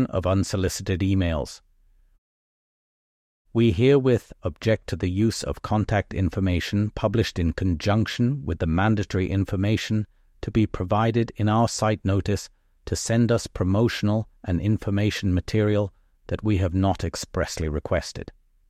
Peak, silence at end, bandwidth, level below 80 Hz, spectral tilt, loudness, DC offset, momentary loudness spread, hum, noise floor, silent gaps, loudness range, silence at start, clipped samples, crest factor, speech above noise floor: -8 dBFS; 0.4 s; 14 kHz; -40 dBFS; -6.5 dB/octave; -24 LUFS; under 0.1%; 7 LU; none; -59 dBFS; 2.18-3.45 s; 2 LU; 0 s; under 0.1%; 16 dB; 35 dB